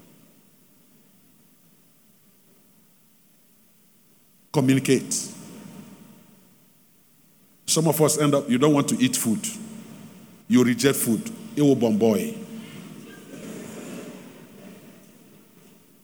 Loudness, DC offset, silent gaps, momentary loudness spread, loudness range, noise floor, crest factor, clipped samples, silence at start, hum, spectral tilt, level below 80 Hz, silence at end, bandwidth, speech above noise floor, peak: -22 LUFS; under 0.1%; none; 24 LU; 10 LU; -58 dBFS; 22 dB; under 0.1%; 4.55 s; none; -4.5 dB/octave; -74 dBFS; 1.3 s; over 20 kHz; 37 dB; -4 dBFS